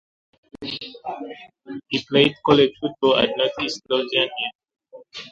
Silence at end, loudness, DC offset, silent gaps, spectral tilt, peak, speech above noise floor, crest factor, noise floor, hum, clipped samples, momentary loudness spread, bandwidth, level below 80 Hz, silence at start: 0 s; -21 LUFS; under 0.1%; 4.55-4.59 s; -5 dB/octave; -2 dBFS; 20 dB; 22 dB; -40 dBFS; none; under 0.1%; 20 LU; 7.8 kHz; -58 dBFS; 0.6 s